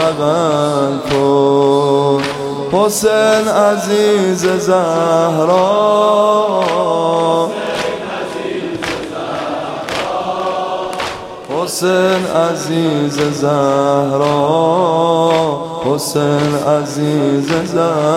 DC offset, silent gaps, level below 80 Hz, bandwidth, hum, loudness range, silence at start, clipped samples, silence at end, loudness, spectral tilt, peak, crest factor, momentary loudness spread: under 0.1%; none; -50 dBFS; 16.5 kHz; none; 7 LU; 0 s; under 0.1%; 0 s; -14 LUFS; -5 dB/octave; 0 dBFS; 14 dB; 9 LU